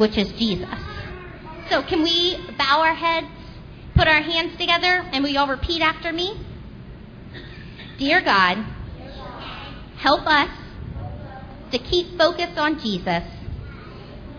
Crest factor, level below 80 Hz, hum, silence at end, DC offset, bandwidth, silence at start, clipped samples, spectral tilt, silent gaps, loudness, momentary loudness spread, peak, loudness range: 22 dB; -40 dBFS; none; 0 s; under 0.1%; 5.4 kHz; 0 s; under 0.1%; -5 dB/octave; none; -20 LUFS; 22 LU; -2 dBFS; 5 LU